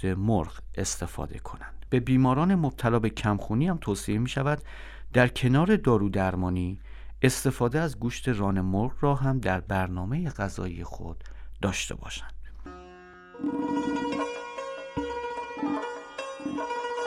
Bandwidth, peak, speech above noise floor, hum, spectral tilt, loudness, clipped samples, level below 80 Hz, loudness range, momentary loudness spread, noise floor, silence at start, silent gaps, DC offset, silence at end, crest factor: 15.5 kHz; -6 dBFS; 22 dB; none; -6 dB/octave; -28 LUFS; under 0.1%; -44 dBFS; 8 LU; 18 LU; -48 dBFS; 0 s; none; under 0.1%; 0 s; 22 dB